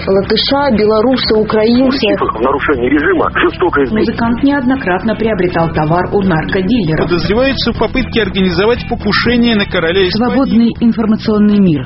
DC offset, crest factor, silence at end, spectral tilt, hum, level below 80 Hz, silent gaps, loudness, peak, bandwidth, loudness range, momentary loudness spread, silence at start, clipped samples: under 0.1%; 12 dB; 0 s; -4.5 dB/octave; none; -30 dBFS; none; -12 LUFS; 0 dBFS; 6 kHz; 2 LU; 3 LU; 0 s; under 0.1%